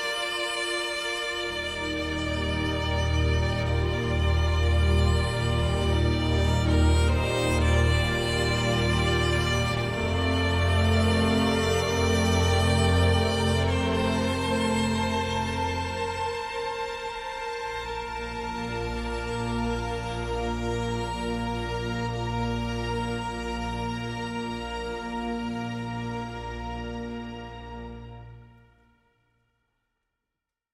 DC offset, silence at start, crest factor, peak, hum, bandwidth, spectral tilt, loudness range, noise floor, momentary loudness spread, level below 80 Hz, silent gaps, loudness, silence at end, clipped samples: under 0.1%; 0 s; 16 dB; -10 dBFS; none; 14 kHz; -5.5 dB/octave; 10 LU; -86 dBFS; 10 LU; -36 dBFS; none; -27 LUFS; 2.25 s; under 0.1%